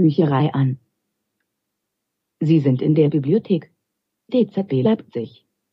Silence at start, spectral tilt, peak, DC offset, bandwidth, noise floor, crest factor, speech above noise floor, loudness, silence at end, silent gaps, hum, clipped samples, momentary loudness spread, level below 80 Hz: 0 s; -10.5 dB/octave; -4 dBFS; under 0.1%; 5.6 kHz; -79 dBFS; 16 dB; 61 dB; -19 LUFS; 0.45 s; none; none; under 0.1%; 11 LU; -70 dBFS